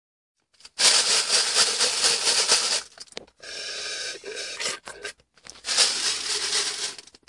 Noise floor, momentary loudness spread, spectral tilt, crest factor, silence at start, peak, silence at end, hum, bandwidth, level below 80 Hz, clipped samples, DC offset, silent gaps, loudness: -49 dBFS; 20 LU; 2.5 dB/octave; 22 dB; 0.75 s; -4 dBFS; 0.3 s; none; 12 kHz; -68 dBFS; under 0.1%; under 0.1%; none; -21 LUFS